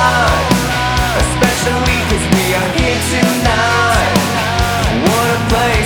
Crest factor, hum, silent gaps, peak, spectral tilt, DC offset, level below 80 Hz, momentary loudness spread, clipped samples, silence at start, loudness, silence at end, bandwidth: 12 dB; none; none; 0 dBFS; -4 dB/octave; under 0.1%; -22 dBFS; 3 LU; under 0.1%; 0 s; -13 LUFS; 0 s; over 20 kHz